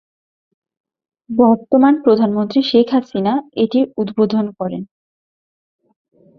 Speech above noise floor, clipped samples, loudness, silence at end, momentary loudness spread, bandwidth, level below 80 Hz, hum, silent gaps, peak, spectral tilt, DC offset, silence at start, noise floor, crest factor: over 75 dB; under 0.1%; -16 LUFS; 1.55 s; 10 LU; 6.2 kHz; -60 dBFS; none; none; -2 dBFS; -8 dB/octave; under 0.1%; 1.3 s; under -90 dBFS; 16 dB